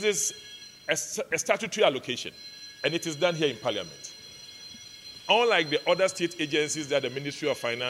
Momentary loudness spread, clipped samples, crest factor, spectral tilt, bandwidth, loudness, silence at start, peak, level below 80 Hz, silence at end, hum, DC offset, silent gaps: 19 LU; under 0.1%; 22 dB; -2.5 dB/octave; 16 kHz; -27 LUFS; 0 s; -8 dBFS; -72 dBFS; 0 s; none; under 0.1%; none